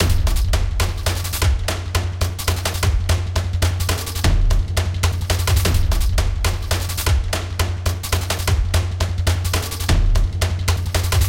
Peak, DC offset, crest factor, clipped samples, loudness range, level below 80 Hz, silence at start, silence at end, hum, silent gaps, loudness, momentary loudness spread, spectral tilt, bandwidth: -4 dBFS; 0.1%; 14 dB; under 0.1%; 1 LU; -22 dBFS; 0 s; 0 s; none; none; -20 LUFS; 4 LU; -4 dB/octave; 17 kHz